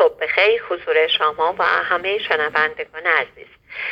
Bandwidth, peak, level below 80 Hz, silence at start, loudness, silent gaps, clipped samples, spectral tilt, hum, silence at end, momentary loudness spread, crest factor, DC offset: 6.4 kHz; -2 dBFS; -60 dBFS; 0 s; -18 LUFS; none; under 0.1%; -3.5 dB/octave; none; 0 s; 7 LU; 18 dB; under 0.1%